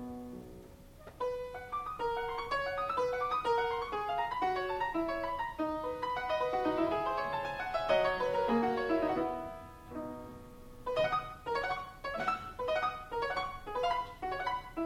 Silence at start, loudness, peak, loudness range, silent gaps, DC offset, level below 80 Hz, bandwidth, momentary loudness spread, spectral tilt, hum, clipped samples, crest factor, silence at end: 0 s; -35 LUFS; -18 dBFS; 4 LU; none; under 0.1%; -56 dBFS; 16 kHz; 13 LU; -5.5 dB/octave; none; under 0.1%; 18 dB; 0 s